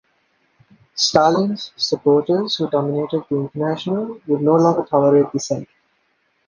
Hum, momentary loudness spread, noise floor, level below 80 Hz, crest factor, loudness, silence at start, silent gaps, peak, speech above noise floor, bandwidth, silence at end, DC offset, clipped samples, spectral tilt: none; 9 LU; -65 dBFS; -60 dBFS; 18 dB; -18 LUFS; 0.95 s; none; 0 dBFS; 47 dB; 9.8 kHz; 0.85 s; under 0.1%; under 0.1%; -5.5 dB/octave